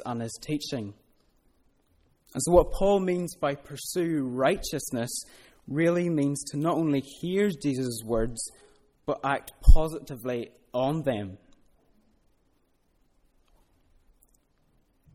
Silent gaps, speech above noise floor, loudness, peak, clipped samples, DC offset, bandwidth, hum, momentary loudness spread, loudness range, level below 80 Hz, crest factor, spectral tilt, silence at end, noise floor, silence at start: none; 43 dB; -28 LUFS; -2 dBFS; under 0.1%; under 0.1%; 15.5 kHz; none; 13 LU; 8 LU; -34 dBFS; 24 dB; -5.5 dB/octave; 3.8 s; -68 dBFS; 0 s